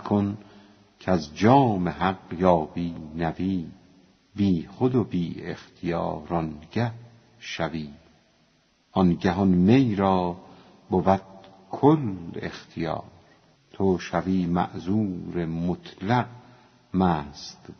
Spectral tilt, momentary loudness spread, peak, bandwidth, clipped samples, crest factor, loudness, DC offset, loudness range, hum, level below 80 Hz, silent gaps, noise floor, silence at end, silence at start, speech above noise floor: -7 dB/octave; 16 LU; -4 dBFS; 6.6 kHz; under 0.1%; 22 dB; -25 LUFS; under 0.1%; 5 LU; none; -52 dBFS; none; -64 dBFS; 0.05 s; 0 s; 40 dB